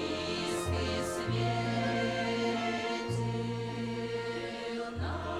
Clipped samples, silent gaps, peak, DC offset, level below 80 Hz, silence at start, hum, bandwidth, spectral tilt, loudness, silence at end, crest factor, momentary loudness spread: under 0.1%; none; -20 dBFS; under 0.1%; -52 dBFS; 0 s; none; 14 kHz; -5.5 dB/octave; -33 LUFS; 0 s; 14 dB; 5 LU